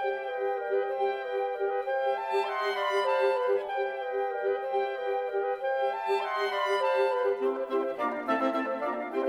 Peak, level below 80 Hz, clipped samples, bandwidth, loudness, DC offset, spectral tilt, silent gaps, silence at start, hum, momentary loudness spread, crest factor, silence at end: -14 dBFS; -76 dBFS; under 0.1%; 12.5 kHz; -29 LUFS; under 0.1%; -3 dB/octave; none; 0 s; none; 5 LU; 14 dB; 0 s